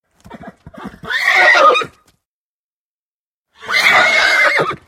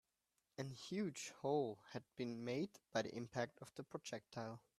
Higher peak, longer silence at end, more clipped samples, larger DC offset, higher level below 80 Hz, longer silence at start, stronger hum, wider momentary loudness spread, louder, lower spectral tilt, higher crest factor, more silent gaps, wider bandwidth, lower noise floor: first, 0 dBFS vs -26 dBFS; about the same, 0.15 s vs 0.2 s; neither; neither; first, -54 dBFS vs -84 dBFS; second, 0.3 s vs 0.6 s; neither; about the same, 12 LU vs 11 LU; first, -10 LUFS vs -47 LUFS; second, -1.5 dB/octave vs -5 dB/octave; about the same, 16 dB vs 20 dB; first, 2.25-3.45 s vs none; first, 16.5 kHz vs 14 kHz; about the same, under -90 dBFS vs -88 dBFS